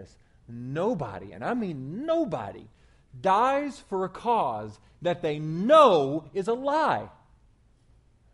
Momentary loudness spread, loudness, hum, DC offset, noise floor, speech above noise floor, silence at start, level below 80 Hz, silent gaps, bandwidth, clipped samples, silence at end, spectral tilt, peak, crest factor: 16 LU; -26 LUFS; none; under 0.1%; -61 dBFS; 35 dB; 0 s; -60 dBFS; none; 11.5 kHz; under 0.1%; 1.25 s; -6.5 dB/octave; -6 dBFS; 22 dB